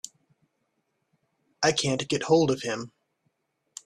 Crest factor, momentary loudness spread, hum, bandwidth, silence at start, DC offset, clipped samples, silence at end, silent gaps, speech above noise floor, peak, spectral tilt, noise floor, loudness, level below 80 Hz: 22 dB; 21 LU; none; 13.5 kHz; 1.6 s; under 0.1%; under 0.1%; 1 s; none; 52 dB; -8 dBFS; -4 dB/octave; -76 dBFS; -25 LUFS; -64 dBFS